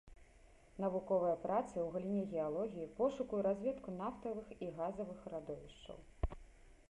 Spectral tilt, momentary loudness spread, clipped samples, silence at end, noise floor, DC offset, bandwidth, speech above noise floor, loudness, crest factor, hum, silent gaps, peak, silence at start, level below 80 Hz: -8 dB/octave; 13 LU; under 0.1%; 0.1 s; -64 dBFS; under 0.1%; 11 kHz; 24 dB; -41 LUFS; 18 dB; none; none; -22 dBFS; 0.05 s; -56 dBFS